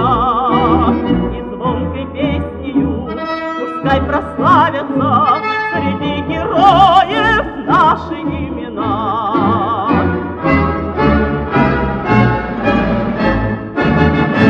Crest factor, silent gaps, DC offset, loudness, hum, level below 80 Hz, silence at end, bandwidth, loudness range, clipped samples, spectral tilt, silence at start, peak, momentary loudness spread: 14 dB; none; under 0.1%; -14 LUFS; none; -28 dBFS; 0 s; 8.2 kHz; 4 LU; under 0.1%; -8 dB/octave; 0 s; 0 dBFS; 9 LU